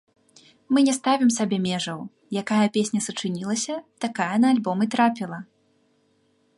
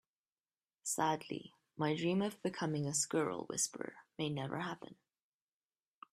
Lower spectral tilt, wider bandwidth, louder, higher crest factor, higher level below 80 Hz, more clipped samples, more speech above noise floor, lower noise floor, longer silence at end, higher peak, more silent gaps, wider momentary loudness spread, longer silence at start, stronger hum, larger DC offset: about the same, -4.5 dB/octave vs -4 dB/octave; second, 11.5 kHz vs 15.5 kHz; first, -23 LUFS vs -38 LUFS; about the same, 18 dB vs 20 dB; first, -72 dBFS vs -80 dBFS; neither; second, 42 dB vs over 52 dB; second, -65 dBFS vs under -90 dBFS; about the same, 1.15 s vs 1.2 s; first, -8 dBFS vs -20 dBFS; neither; about the same, 11 LU vs 13 LU; second, 0.7 s vs 0.85 s; neither; neither